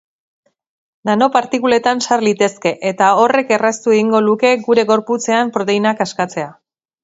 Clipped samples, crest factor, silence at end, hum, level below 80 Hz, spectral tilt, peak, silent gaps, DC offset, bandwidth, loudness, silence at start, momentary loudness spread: under 0.1%; 16 dB; 0.5 s; none; -62 dBFS; -4 dB/octave; 0 dBFS; none; under 0.1%; 8 kHz; -15 LUFS; 1.05 s; 6 LU